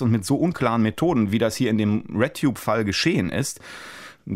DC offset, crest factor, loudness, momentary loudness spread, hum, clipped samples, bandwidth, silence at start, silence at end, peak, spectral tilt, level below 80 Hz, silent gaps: under 0.1%; 16 dB; -22 LUFS; 15 LU; none; under 0.1%; 16 kHz; 0 s; 0 s; -6 dBFS; -5.5 dB/octave; -52 dBFS; none